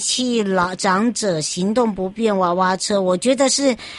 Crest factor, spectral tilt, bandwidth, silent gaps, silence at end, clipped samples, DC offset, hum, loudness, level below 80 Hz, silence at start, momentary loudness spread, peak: 14 dB; -3.5 dB/octave; 11.5 kHz; none; 0 s; under 0.1%; under 0.1%; none; -18 LUFS; -54 dBFS; 0 s; 5 LU; -4 dBFS